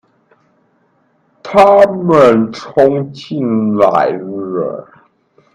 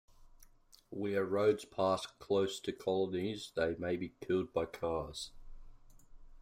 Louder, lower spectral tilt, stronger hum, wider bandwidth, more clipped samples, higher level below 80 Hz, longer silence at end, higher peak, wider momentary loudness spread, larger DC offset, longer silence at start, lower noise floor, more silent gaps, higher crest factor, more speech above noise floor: first, -12 LUFS vs -36 LUFS; first, -7.5 dB/octave vs -5.5 dB/octave; neither; second, 10 kHz vs 16 kHz; first, 0.2% vs under 0.1%; first, -50 dBFS vs -60 dBFS; first, 0.7 s vs 0 s; first, 0 dBFS vs -18 dBFS; first, 14 LU vs 9 LU; neither; first, 1.45 s vs 0.2 s; second, -57 dBFS vs -63 dBFS; neither; about the same, 14 dB vs 18 dB; first, 46 dB vs 27 dB